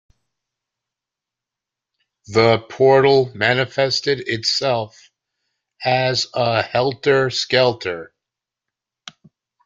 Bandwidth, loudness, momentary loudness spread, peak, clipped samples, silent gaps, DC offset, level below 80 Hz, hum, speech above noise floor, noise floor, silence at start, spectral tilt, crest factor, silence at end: 7.8 kHz; -18 LUFS; 9 LU; -2 dBFS; under 0.1%; none; under 0.1%; -58 dBFS; none; 68 dB; -86 dBFS; 2.3 s; -4.5 dB/octave; 18 dB; 1.6 s